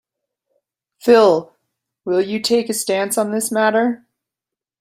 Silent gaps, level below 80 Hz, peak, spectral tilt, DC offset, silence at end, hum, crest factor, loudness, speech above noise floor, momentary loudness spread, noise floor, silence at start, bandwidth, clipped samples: none; -66 dBFS; -2 dBFS; -3.5 dB/octave; under 0.1%; 0.85 s; none; 18 dB; -17 LUFS; 71 dB; 10 LU; -87 dBFS; 1.05 s; 16 kHz; under 0.1%